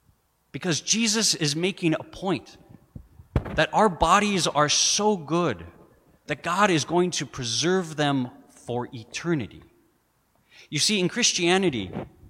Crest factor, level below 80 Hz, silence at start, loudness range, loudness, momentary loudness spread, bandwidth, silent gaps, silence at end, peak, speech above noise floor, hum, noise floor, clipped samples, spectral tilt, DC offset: 22 dB; -48 dBFS; 0.55 s; 6 LU; -23 LUFS; 13 LU; 16 kHz; none; 0 s; -4 dBFS; 43 dB; none; -67 dBFS; under 0.1%; -3 dB/octave; under 0.1%